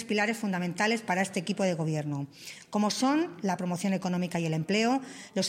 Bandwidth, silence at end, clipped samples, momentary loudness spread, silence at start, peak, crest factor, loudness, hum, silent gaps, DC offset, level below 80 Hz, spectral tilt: 16 kHz; 0 s; under 0.1%; 8 LU; 0 s; -14 dBFS; 16 dB; -29 LUFS; none; none; under 0.1%; -74 dBFS; -5 dB/octave